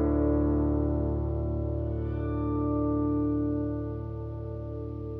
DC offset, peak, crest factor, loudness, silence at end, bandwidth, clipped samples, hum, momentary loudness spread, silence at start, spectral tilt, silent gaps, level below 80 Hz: under 0.1%; -14 dBFS; 14 dB; -30 LUFS; 0 s; 2.5 kHz; under 0.1%; none; 11 LU; 0 s; -13 dB/octave; none; -36 dBFS